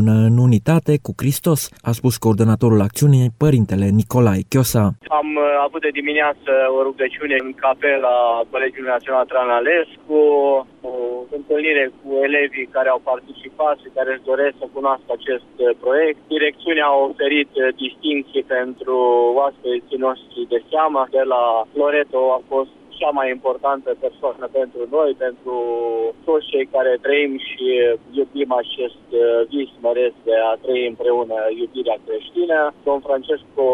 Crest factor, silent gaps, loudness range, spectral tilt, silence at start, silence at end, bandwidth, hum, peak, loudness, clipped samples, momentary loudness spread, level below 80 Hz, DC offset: 14 dB; none; 4 LU; -6 dB/octave; 0 s; 0 s; 16 kHz; none; -4 dBFS; -18 LUFS; under 0.1%; 8 LU; -52 dBFS; under 0.1%